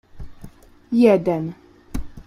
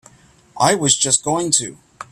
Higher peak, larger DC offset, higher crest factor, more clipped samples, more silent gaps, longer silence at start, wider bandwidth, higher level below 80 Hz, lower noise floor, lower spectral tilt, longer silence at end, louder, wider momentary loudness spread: about the same, -2 dBFS vs 0 dBFS; neither; about the same, 18 dB vs 20 dB; neither; neither; second, 0.15 s vs 0.55 s; second, 14 kHz vs 15.5 kHz; first, -40 dBFS vs -56 dBFS; second, -43 dBFS vs -49 dBFS; first, -8 dB/octave vs -2.5 dB/octave; about the same, 0.05 s vs 0.1 s; about the same, -18 LUFS vs -16 LUFS; first, 19 LU vs 5 LU